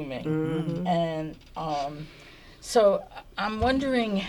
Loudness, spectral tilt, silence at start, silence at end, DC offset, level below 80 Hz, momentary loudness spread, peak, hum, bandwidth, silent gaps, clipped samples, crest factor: -27 LUFS; -6 dB/octave; 0 s; 0 s; under 0.1%; -48 dBFS; 16 LU; -10 dBFS; none; 17.5 kHz; none; under 0.1%; 18 dB